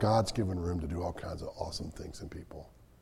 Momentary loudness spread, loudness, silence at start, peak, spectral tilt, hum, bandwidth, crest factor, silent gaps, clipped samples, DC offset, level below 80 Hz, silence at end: 18 LU; -36 LUFS; 0 s; -14 dBFS; -6 dB/octave; none; 14 kHz; 20 dB; none; under 0.1%; under 0.1%; -50 dBFS; 0.15 s